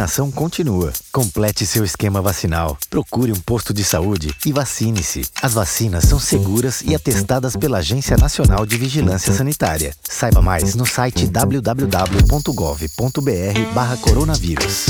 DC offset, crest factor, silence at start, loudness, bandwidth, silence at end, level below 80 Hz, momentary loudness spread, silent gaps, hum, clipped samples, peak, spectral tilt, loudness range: under 0.1%; 16 dB; 0 s; -17 LUFS; over 20 kHz; 0 s; -24 dBFS; 5 LU; none; none; under 0.1%; -2 dBFS; -5 dB/octave; 2 LU